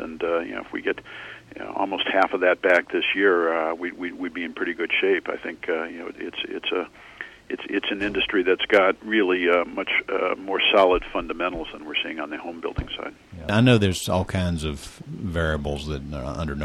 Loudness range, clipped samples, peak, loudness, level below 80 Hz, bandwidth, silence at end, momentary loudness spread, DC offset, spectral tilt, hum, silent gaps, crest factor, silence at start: 6 LU; under 0.1%; -6 dBFS; -23 LUFS; -44 dBFS; 14.5 kHz; 0 s; 15 LU; under 0.1%; -5.5 dB/octave; none; none; 18 dB; 0 s